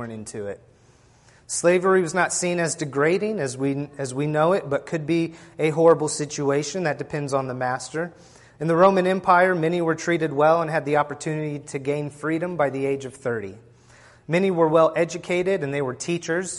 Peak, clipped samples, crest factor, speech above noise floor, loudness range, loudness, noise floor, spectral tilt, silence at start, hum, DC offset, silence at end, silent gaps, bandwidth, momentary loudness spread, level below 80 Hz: -4 dBFS; under 0.1%; 20 dB; 33 dB; 4 LU; -22 LUFS; -55 dBFS; -5 dB/octave; 0 s; none; under 0.1%; 0 s; none; 11.5 kHz; 12 LU; -62 dBFS